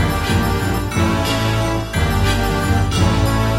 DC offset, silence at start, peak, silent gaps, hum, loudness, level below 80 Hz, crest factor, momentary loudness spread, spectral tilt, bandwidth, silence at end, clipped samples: under 0.1%; 0 s; -2 dBFS; none; none; -18 LUFS; -24 dBFS; 14 dB; 3 LU; -5.5 dB/octave; 16 kHz; 0 s; under 0.1%